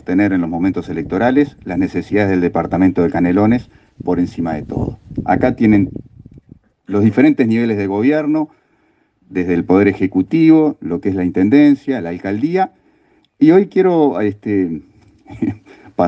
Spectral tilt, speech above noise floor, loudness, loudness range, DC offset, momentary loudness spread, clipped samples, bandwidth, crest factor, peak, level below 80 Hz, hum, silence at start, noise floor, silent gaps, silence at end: -9 dB/octave; 44 dB; -15 LUFS; 3 LU; under 0.1%; 12 LU; under 0.1%; 6.6 kHz; 16 dB; 0 dBFS; -46 dBFS; none; 0.1 s; -58 dBFS; none; 0 s